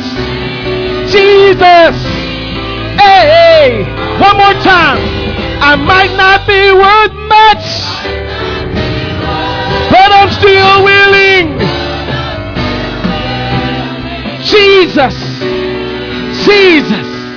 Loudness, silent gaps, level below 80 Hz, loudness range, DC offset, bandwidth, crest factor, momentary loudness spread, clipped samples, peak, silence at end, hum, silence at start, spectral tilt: -7 LUFS; none; -26 dBFS; 4 LU; under 0.1%; 5.4 kHz; 8 dB; 13 LU; 4%; 0 dBFS; 0 s; none; 0 s; -5.5 dB/octave